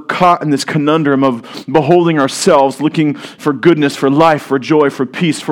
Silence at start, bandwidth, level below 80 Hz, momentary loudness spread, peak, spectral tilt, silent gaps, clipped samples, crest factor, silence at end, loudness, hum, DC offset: 0 s; 16 kHz; -54 dBFS; 6 LU; 0 dBFS; -5.5 dB/octave; none; 0.3%; 12 dB; 0 s; -12 LUFS; none; under 0.1%